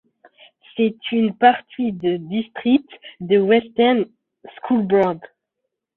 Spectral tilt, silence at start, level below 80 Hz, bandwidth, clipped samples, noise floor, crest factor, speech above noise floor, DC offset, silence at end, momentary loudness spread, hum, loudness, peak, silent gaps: -9 dB/octave; 0.75 s; -64 dBFS; 4.2 kHz; under 0.1%; -79 dBFS; 18 dB; 60 dB; under 0.1%; 0.7 s; 13 LU; none; -19 LUFS; -2 dBFS; none